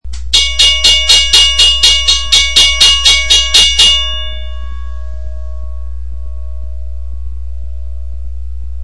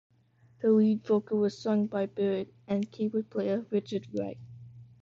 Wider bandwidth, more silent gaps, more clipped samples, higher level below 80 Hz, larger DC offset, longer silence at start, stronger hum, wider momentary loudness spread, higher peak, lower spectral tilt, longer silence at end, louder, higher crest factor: first, 12 kHz vs 7.2 kHz; neither; first, 0.9% vs under 0.1%; first, -22 dBFS vs -70 dBFS; first, 9% vs under 0.1%; second, 0 s vs 0.6 s; neither; first, 21 LU vs 11 LU; first, 0 dBFS vs -14 dBFS; second, 0.5 dB/octave vs -8 dB/octave; second, 0 s vs 0.2 s; first, -6 LUFS vs -30 LUFS; about the same, 12 dB vs 16 dB